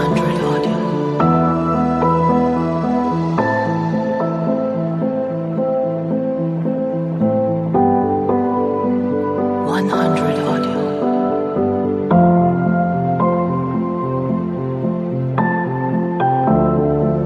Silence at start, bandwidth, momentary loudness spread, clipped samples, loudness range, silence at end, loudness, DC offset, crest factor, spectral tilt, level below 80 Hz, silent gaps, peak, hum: 0 s; 9.6 kHz; 5 LU; under 0.1%; 3 LU; 0 s; -17 LUFS; under 0.1%; 16 dB; -9 dB/octave; -44 dBFS; none; -2 dBFS; none